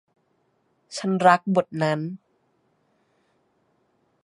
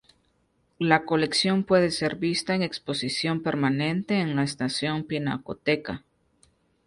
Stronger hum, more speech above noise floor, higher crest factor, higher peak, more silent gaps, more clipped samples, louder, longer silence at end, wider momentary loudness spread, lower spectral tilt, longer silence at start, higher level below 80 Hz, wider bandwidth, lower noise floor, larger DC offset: neither; first, 47 dB vs 43 dB; about the same, 24 dB vs 22 dB; first, -2 dBFS vs -6 dBFS; neither; neither; first, -22 LUFS vs -25 LUFS; first, 2.1 s vs 0.9 s; first, 18 LU vs 7 LU; about the same, -6 dB/octave vs -5 dB/octave; about the same, 0.9 s vs 0.8 s; second, -74 dBFS vs -60 dBFS; about the same, 11.5 kHz vs 11.5 kHz; about the same, -69 dBFS vs -69 dBFS; neither